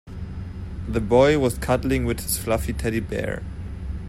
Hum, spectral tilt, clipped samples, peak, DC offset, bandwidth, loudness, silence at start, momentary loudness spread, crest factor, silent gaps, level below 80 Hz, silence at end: none; -5.5 dB/octave; under 0.1%; -4 dBFS; under 0.1%; 16 kHz; -23 LUFS; 0.05 s; 17 LU; 18 dB; none; -34 dBFS; 0 s